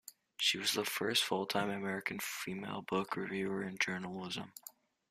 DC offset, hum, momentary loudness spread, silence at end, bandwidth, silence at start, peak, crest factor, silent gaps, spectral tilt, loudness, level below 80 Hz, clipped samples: under 0.1%; none; 11 LU; 0.4 s; 15.5 kHz; 0.05 s; -16 dBFS; 22 dB; none; -3 dB/octave; -36 LUFS; -76 dBFS; under 0.1%